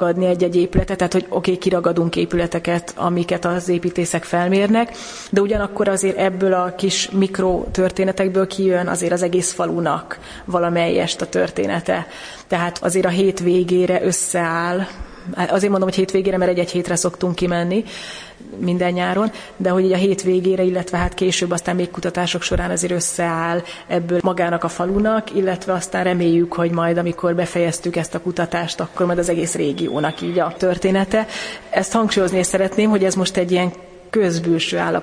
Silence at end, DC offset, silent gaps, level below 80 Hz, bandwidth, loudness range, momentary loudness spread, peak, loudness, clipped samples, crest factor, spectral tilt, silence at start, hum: 0 s; under 0.1%; none; -40 dBFS; 10.5 kHz; 2 LU; 6 LU; -2 dBFS; -19 LUFS; under 0.1%; 16 dB; -5 dB/octave; 0 s; none